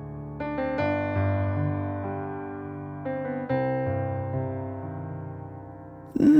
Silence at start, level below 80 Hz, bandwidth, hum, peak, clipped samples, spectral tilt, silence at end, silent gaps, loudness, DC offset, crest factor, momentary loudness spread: 0 s; -54 dBFS; 6 kHz; none; -8 dBFS; under 0.1%; -9.5 dB/octave; 0 s; none; -30 LUFS; under 0.1%; 18 dB; 12 LU